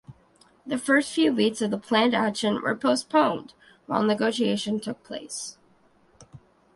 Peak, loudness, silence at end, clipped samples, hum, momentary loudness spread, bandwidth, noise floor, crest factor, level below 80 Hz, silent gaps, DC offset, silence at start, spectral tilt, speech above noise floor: -8 dBFS; -25 LUFS; 0.4 s; under 0.1%; none; 13 LU; 11.5 kHz; -61 dBFS; 18 dB; -68 dBFS; none; under 0.1%; 0.1 s; -4 dB/octave; 36 dB